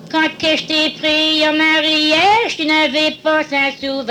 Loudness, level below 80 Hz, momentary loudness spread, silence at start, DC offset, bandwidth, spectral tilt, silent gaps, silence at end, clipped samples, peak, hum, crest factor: -14 LUFS; -54 dBFS; 5 LU; 0 s; under 0.1%; 13.5 kHz; -2.5 dB/octave; none; 0 s; under 0.1%; -4 dBFS; none; 12 dB